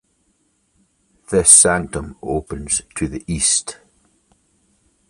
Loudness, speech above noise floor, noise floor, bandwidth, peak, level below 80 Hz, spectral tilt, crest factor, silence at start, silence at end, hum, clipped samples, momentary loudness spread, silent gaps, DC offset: -15 LUFS; 47 dB; -64 dBFS; 16 kHz; 0 dBFS; -40 dBFS; -2.5 dB/octave; 20 dB; 1.3 s; 1.35 s; none; under 0.1%; 18 LU; none; under 0.1%